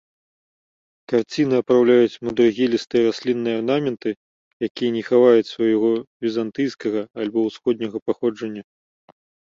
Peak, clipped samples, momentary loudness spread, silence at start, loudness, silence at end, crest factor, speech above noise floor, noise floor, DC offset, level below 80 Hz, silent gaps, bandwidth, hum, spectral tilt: -4 dBFS; under 0.1%; 11 LU; 1.1 s; -20 LUFS; 0.95 s; 18 dB; over 70 dB; under -90 dBFS; under 0.1%; -64 dBFS; 4.17-4.60 s, 4.70-4.75 s, 6.07-6.20 s, 8.02-8.06 s; 7.4 kHz; none; -6.5 dB/octave